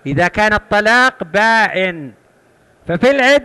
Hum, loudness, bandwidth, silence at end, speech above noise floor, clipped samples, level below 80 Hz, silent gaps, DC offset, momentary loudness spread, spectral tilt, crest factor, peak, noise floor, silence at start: none; -13 LUFS; 12 kHz; 0 s; 38 dB; under 0.1%; -42 dBFS; none; under 0.1%; 11 LU; -4.5 dB/octave; 12 dB; -2 dBFS; -52 dBFS; 0.05 s